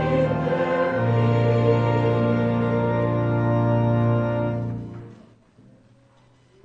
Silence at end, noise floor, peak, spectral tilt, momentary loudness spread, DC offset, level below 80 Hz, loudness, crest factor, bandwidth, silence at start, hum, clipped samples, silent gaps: 1.5 s; -56 dBFS; -8 dBFS; -9.5 dB/octave; 7 LU; under 0.1%; -48 dBFS; -22 LUFS; 14 dB; 5.8 kHz; 0 s; none; under 0.1%; none